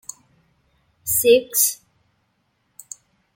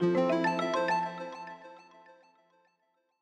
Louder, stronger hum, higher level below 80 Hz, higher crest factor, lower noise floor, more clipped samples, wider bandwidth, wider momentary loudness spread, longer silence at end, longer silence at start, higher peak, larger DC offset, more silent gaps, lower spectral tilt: first, -18 LUFS vs -30 LUFS; neither; first, -58 dBFS vs -82 dBFS; about the same, 20 dB vs 16 dB; second, -68 dBFS vs -76 dBFS; neither; first, 17 kHz vs 9.8 kHz; first, 24 LU vs 20 LU; first, 1.6 s vs 1.45 s; first, 1.05 s vs 0 s; first, -4 dBFS vs -16 dBFS; neither; neither; second, -1.5 dB/octave vs -6 dB/octave